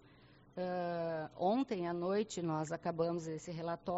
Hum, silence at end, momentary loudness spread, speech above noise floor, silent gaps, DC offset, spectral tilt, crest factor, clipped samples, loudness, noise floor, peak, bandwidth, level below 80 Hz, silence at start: none; 0 s; 7 LU; 25 dB; none; under 0.1%; -6 dB/octave; 16 dB; under 0.1%; -38 LUFS; -63 dBFS; -22 dBFS; 8 kHz; -72 dBFS; 0.2 s